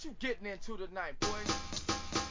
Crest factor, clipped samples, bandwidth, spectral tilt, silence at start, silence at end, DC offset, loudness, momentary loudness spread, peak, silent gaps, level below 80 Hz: 18 dB; under 0.1%; 7.8 kHz; -3 dB/octave; 0 s; 0 s; under 0.1%; -38 LUFS; 8 LU; -20 dBFS; none; -52 dBFS